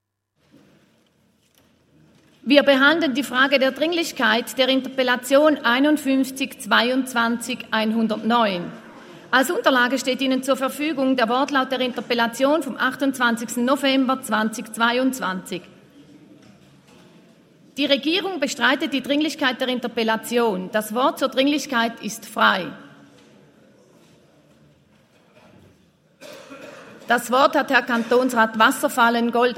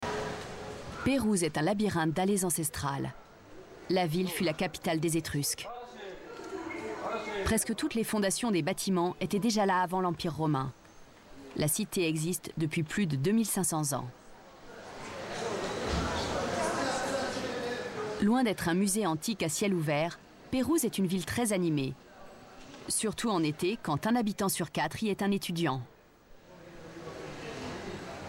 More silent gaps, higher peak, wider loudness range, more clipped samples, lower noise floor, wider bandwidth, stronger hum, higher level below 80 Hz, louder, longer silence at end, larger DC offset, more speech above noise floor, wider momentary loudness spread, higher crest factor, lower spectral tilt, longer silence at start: neither; first, 0 dBFS vs -18 dBFS; first, 7 LU vs 4 LU; neither; first, -67 dBFS vs -56 dBFS; about the same, 16 kHz vs 16.5 kHz; neither; second, -72 dBFS vs -54 dBFS; first, -20 LUFS vs -31 LUFS; about the same, 0 s vs 0 s; neither; first, 47 dB vs 26 dB; second, 9 LU vs 15 LU; first, 22 dB vs 14 dB; second, -3 dB/octave vs -4.5 dB/octave; first, 2.45 s vs 0 s